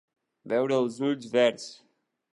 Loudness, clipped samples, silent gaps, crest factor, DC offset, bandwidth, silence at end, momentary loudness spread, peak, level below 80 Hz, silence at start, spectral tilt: -27 LUFS; under 0.1%; none; 18 dB; under 0.1%; 11.5 kHz; 0.6 s; 13 LU; -10 dBFS; -82 dBFS; 0.45 s; -5 dB/octave